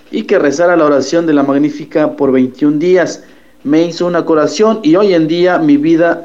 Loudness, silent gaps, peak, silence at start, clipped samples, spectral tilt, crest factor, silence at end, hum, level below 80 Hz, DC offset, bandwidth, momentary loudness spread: -11 LUFS; none; 0 dBFS; 0.1 s; under 0.1%; -6 dB/octave; 10 dB; 0 s; none; -56 dBFS; 0.6%; 7.8 kHz; 5 LU